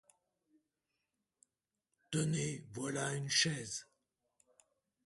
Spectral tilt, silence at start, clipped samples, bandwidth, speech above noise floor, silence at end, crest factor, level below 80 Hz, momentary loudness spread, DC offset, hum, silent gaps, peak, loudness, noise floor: -3.5 dB/octave; 2.1 s; under 0.1%; 11.5 kHz; 51 dB; 1.2 s; 24 dB; -74 dBFS; 11 LU; under 0.1%; none; none; -18 dBFS; -37 LUFS; -89 dBFS